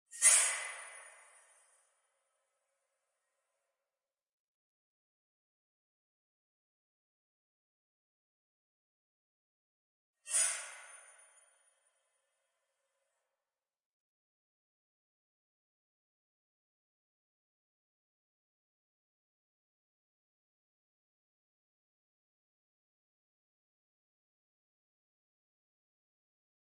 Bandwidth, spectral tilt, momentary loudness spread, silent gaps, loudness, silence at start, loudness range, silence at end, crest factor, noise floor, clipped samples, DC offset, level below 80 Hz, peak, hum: 11.5 kHz; 8 dB/octave; 25 LU; 4.33-10.14 s; -29 LUFS; 0.15 s; 19 LU; 15.65 s; 34 dB; under -90 dBFS; under 0.1%; under 0.1%; under -90 dBFS; -12 dBFS; none